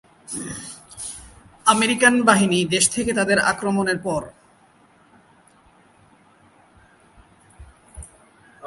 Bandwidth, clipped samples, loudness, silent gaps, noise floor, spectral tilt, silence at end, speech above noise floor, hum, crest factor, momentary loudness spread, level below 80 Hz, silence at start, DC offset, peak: 11.5 kHz; under 0.1%; -19 LUFS; none; -55 dBFS; -3 dB/octave; 0 s; 35 dB; none; 24 dB; 23 LU; -52 dBFS; 0.3 s; under 0.1%; 0 dBFS